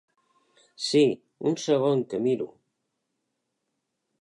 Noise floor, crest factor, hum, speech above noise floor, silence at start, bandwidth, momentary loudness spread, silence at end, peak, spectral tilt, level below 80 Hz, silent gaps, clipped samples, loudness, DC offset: -80 dBFS; 18 dB; none; 56 dB; 0.8 s; 11.5 kHz; 9 LU; 1.75 s; -10 dBFS; -5.5 dB/octave; -76 dBFS; none; under 0.1%; -25 LUFS; under 0.1%